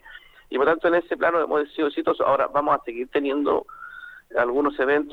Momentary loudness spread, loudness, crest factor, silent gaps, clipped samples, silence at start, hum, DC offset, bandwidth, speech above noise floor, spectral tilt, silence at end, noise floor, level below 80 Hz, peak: 9 LU; -23 LUFS; 18 dB; none; under 0.1%; 0.05 s; none; under 0.1%; 5.4 kHz; 25 dB; -6.5 dB/octave; 0 s; -47 dBFS; -56 dBFS; -6 dBFS